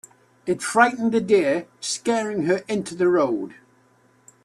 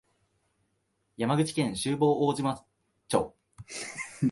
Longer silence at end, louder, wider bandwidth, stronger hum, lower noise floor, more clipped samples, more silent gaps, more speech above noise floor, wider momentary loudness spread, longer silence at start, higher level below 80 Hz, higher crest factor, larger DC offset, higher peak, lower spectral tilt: first, 0.9 s vs 0 s; first, -22 LUFS vs -29 LUFS; first, 13 kHz vs 11.5 kHz; neither; second, -59 dBFS vs -76 dBFS; neither; neither; second, 38 dB vs 48 dB; second, 10 LU vs 14 LU; second, 0.45 s vs 1.2 s; about the same, -66 dBFS vs -62 dBFS; about the same, 20 dB vs 22 dB; neither; first, -4 dBFS vs -8 dBFS; about the same, -4.5 dB/octave vs -5.5 dB/octave